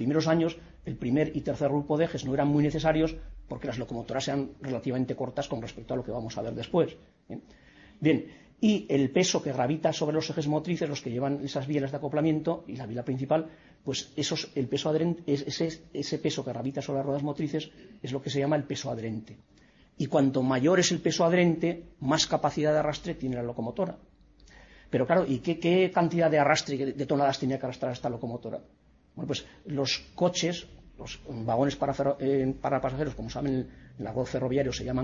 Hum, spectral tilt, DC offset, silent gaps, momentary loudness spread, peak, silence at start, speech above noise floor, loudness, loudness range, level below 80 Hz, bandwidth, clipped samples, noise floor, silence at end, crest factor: none; -5.5 dB/octave; under 0.1%; none; 11 LU; -8 dBFS; 0 s; 28 dB; -29 LUFS; 6 LU; -54 dBFS; 7.8 kHz; under 0.1%; -56 dBFS; 0 s; 20 dB